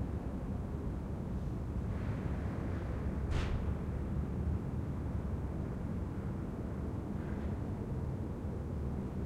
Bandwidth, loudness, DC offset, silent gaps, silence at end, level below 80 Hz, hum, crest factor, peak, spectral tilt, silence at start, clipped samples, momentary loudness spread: 10.5 kHz; -39 LUFS; under 0.1%; none; 0 s; -42 dBFS; none; 14 dB; -22 dBFS; -8.5 dB/octave; 0 s; under 0.1%; 3 LU